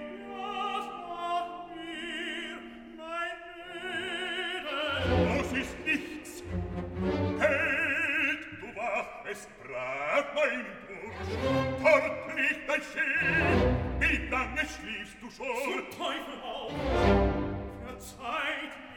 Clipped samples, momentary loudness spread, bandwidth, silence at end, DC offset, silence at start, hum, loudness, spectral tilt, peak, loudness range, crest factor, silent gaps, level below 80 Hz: under 0.1%; 15 LU; 18 kHz; 0 s; under 0.1%; 0 s; none; -30 LUFS; -5.5 dB/octave; -10 dBFS; 8 LU; 22 dB; none; -44 dBFS